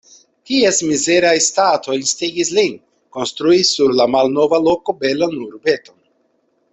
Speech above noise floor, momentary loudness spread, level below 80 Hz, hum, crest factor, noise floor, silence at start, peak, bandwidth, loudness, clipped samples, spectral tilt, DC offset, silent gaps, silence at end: 47 dB; 8 LU; -58 dBFS; none; 14 dB; -63 dBFS; 0.5 s; -2 dBFS; 8.4 kHz; -15 LUFS; under 0.1%; -2.5 dB/octave; under 0.1%; none; 0.95 s